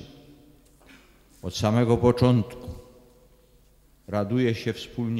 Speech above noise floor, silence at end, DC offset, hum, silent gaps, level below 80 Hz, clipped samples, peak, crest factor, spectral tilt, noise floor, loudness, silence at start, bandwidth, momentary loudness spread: 35 dB; 0 s; under 0.1%; none; none; -50 dBFS; under 0.1%; -6 dBFS; 20 dB; -7 dB/octave; -58 dBFS; -24 LUFS; 0 s; 13 kHz; 20 LU